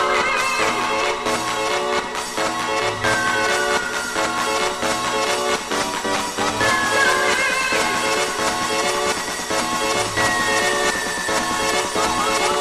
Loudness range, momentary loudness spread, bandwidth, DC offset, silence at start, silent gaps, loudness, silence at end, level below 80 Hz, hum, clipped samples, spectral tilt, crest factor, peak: 2 LU; 4 LU; 12.5 kHz; under 0.1%; 0 s; none; -19 LUFS; 0 s; -46 dBFS; none; under 0.1%; -1.5 dB/octave; 16 dB; -6 dBFS